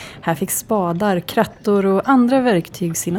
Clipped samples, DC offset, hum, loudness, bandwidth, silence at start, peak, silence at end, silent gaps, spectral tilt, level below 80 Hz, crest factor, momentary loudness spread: under 0.1%; under 0.1%; none; -18 LUFS; 19 kHz; 0 s; 0 dBFS; 0 s; none; -5.5 dB/octave; -52 dBFS; 18 dB; 8 LU